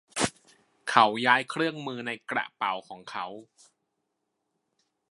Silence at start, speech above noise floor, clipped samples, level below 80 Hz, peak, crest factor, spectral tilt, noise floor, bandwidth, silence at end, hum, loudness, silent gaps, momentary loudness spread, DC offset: 0.15 s; 53 dB; under 0.1%; -68 dBFS; -2 dBFS; 28 dB; -3 dB/octave; -80 dBFS; 11.5 kHz; 1.7 s; none; -27 LUFS; none; 17 LU; under 0.1%